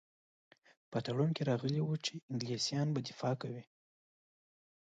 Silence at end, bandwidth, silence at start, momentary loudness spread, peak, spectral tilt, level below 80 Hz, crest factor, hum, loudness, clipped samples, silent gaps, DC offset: 1.25 s; 9 kHz; 0.9 s; 7 LU; -20 dBFS; -5.5 dB/octave; -78 dBFS; 18 dB; none; -37 LUFS; under 0.1%; 2.23-2.28 s; under 0.1%